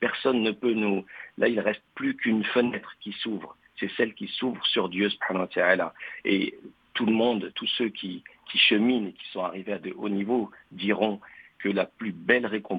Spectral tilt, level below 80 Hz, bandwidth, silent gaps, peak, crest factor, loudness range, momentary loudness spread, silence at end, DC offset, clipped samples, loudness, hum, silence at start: -7.5 dB/octave; -70 dBFS; 5 kHz; none; -6 dBFS; 22 dB; 3 LU; 11 LU; 0 s; under 0.1%; under 0.1%; -27 LUFS; none; 0 s